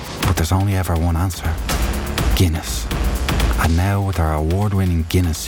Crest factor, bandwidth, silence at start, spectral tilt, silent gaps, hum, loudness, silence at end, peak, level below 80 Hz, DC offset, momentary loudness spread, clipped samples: 14 dB; 19 kHz; 0 s; -5.5 dB/octave; none; none; -19 LUFS; 0 s; -4 dBFS; -24 dBFS; under 0.1%; 4 LU; under 0.1%